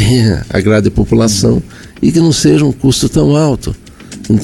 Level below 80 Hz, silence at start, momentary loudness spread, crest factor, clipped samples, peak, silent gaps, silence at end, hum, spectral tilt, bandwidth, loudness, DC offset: -28 dBFS; 0 s; 15 LU; 10 dB; under 0.1%; 0 dBFS; none; 0 s; none; -5.5 dB/octave; 17 kHz; -11 LUFS; under 0.1%